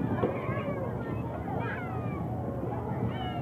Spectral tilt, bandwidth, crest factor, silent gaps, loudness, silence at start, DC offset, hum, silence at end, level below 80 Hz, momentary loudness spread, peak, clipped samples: -9 dB/octave; 15.5 kHz; 18 dB; none; -33 LUFS; 0 s; under 0.1%; none; 0 s; -48 dBFS; 4 LU; -14 dBFS; under 0.1%